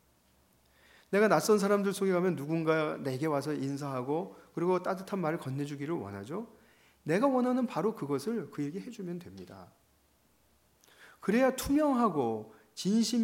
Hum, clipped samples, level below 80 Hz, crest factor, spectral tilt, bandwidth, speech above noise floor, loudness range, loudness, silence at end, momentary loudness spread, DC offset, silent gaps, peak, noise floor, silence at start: none; under 0.1%; -64 dBFS; 22 dB; -6 dB/octave; 16.5 kHz; 38 dB; 6 LU; -31 LUFS; 0 s; 15 LU; under 0.1%; none; -10 dBFS; -69 dBFS; 1.1 s